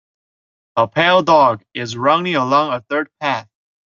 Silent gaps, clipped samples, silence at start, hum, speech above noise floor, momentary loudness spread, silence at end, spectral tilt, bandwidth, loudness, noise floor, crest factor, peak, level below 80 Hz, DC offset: none; under 0.1%; 0.75 s; none; over 74 dB; 12 LU; 0.45 s; -5 dB/octave; 7.4 kHz; -16 LUFS; under -90 dBFS; 16 dB; -2 dBFS; -62 dBFS; under 0.1%